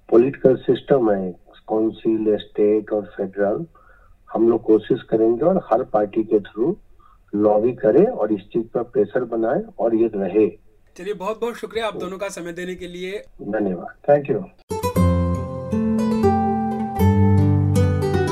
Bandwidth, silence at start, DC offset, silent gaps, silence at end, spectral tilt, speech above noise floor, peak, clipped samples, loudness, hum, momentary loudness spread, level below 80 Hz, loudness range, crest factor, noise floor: 14 kHz; 0.1 s; under 0.1%; 14.63-14.68 s; 0 s; -8 dB/octave; 30 dB; 0 dBFS; under 0.1%; -20 LUFS; none; 12 LU; -44 dBFS; 5 LU; 18 dB; -50 dBFS